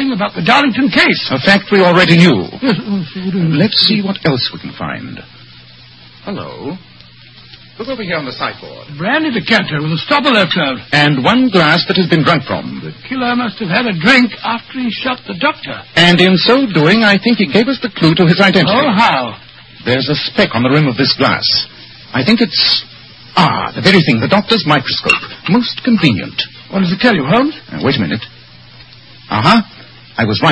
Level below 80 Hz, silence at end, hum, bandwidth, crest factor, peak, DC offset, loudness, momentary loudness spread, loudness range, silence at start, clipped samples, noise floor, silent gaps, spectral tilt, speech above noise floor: -46 dBFS; 0 s; none; 11 kHz; 12 dB; 0 dBFS; 0.2%; -12 LUFS; 14 LU; 7 LU; 0 s; 0.1%; -39 dBFS; none; -6 dB/octave; 27 dB